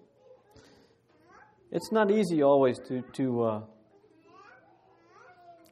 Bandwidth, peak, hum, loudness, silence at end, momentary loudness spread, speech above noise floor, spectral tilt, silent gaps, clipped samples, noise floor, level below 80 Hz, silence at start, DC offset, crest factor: 13.5 kHz; -12 dBFS; none; -27 LUFS; 0.2 s; 14 LU; 36 dB; -7 dB/octave; none; under 0.1%; -63 dBFS; -74 dBFS; 1.7 s; under 0.1%; 20 dB